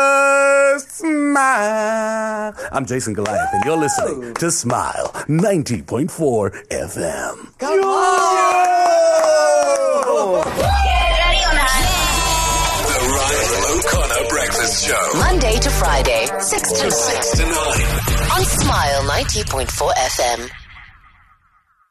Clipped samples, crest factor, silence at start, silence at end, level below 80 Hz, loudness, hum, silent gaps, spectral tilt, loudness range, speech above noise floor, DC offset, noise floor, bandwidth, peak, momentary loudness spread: under 0.1%; 12 dB; 0 s; 1.05 s; -26 dBFS; -16 LUFS; none; none; -3.5 dB/octave; 5 LU; 41 dB; under 0.1%; -58 dBFS; 13 kHz; -4 dBFS; 9 LU